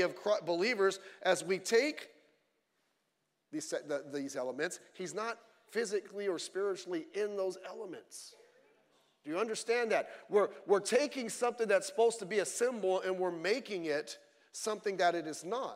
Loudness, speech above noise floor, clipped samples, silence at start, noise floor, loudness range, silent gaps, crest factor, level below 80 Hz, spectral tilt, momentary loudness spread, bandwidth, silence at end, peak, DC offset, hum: -34 LUFS; 47 dB; under 0.1%; 0 s; -82 dBFS; 8 LU; none; 20 dB; under -90 dBFS; -3 dB/octave; 14 LU; 16 kHz; 0 s; -16 dBFS; under 0.1%; none